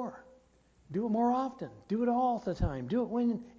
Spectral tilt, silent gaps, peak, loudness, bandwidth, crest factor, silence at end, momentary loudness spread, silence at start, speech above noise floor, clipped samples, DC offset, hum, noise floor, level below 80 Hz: -8.5 dB/octave; none; -18 dBFS; -32 LUFS; 7.4 kHz; 14 dB; 0.05 s; 10 LU; 0 s; 34 dB; under 0.1%; under 0.1%; none; -65 dBFS; -48 dBFS